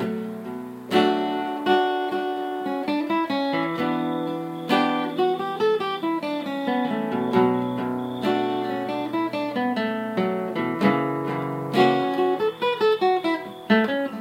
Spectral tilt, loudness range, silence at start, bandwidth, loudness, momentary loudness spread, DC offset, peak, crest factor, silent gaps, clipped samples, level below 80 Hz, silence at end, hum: -6.5 dB/octave; 2 LU; 0 s; 16 kHz; -24 LUFS; 7 LU; under 0.1%; -4 dBFS; 20 dB; none; under 0.1%; -72 dBFS; 0 s; none